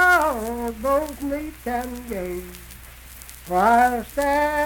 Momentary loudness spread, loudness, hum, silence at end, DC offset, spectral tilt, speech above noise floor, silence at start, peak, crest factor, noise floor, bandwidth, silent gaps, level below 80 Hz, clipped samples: 23 LU; -22 LUFS; none; 0 s; under 0.1%; -4.5 dB/octave; 20 dB; 0 s; -6 dBFS; 16 dB; -42 dBFS; 19 kHz; none; -42 dBFS; under 0.1%